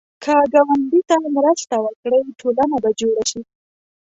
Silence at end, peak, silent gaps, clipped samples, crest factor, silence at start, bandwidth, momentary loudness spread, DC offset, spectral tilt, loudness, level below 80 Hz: 0.7 s; -2 dBFS; 1.96-2.03 s; under 0.1%; 16 dB; 0.2 s; 8.2 kHz; 7 LU; under 0.1%; -3.5 dB/octave; -17 LUFS; -58 dBFS